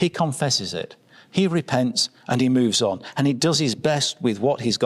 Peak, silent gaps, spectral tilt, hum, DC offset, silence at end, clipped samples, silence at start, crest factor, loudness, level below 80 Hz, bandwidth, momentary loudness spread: -6 dBFS; none; -4.5 dB/octave; none; under 0.1%; 0 s; under 0.1%; 0 s; 16 dB; -22 LUFS; -64 dBFS; 13 kHz; 5 LU